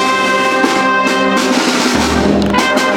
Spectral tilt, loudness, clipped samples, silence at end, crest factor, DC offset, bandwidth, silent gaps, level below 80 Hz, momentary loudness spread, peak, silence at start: -3.5 dB/octave; -12 LUFS; under 0.1%; 0 s; 12 dB; under 0.1%; 18 kHz; none; -32 dBFS; 1 LU; 0 dBFS; 0 s